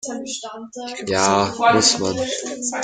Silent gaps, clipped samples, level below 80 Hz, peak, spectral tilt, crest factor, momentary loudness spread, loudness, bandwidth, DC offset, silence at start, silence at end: none; under 0.1%; -56 dBFS; -2 dBFS; -2.5 dB/octave; 20 dB; 16 LU; -19 LUFS; 10 kHz; under 0.1%; 0.05 s; 0 s